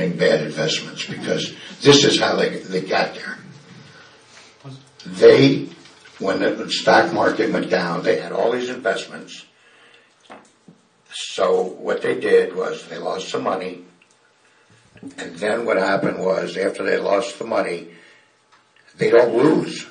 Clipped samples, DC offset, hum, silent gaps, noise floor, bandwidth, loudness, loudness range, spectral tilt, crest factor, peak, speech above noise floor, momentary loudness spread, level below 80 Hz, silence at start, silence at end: under 0.1%; under 0.1%; none; none; -57 dBFS; 10 kHz; -19 LUFS; 8 LU; -4.5 dB/octave; 20 dB; 0 dBFS; 38 dB; 19 LU; -66 dBFS; 0 s; 0 s